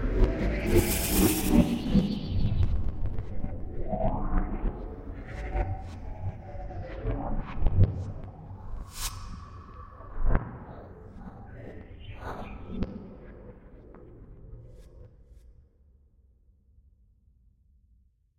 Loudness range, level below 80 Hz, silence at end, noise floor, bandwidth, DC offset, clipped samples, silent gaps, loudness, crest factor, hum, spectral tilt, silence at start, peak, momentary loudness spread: 17 LU; -34 dBFS; 2.9 s; -64 dBFS; 16.5 kHz; under 0.1%; under 0.1%; none; -31 LUFS; 22 dB; none; -6 dB/octave; 0 s; -8 dBFS; 24 LU